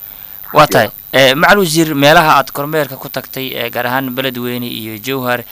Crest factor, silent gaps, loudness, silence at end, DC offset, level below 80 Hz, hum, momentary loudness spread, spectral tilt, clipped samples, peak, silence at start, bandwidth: 14 dB; none; -12 LUFS; 0 s; under 0.1%; -44 dBFS; none; 14 LU; -4 dB/octave; 0.3%; 0 dBFS; 0 s; 16.5 kHz